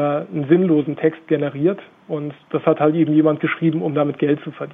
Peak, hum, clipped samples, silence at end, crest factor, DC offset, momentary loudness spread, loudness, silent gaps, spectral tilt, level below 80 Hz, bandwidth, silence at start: -2 dBFS; none; under 0.1%; 0 s; 16 dB; under 0.1%; 11 LU; -19 LUFS; none; -10.5 dB/octave; -66 dBFS; 3.8 kHz; 0 s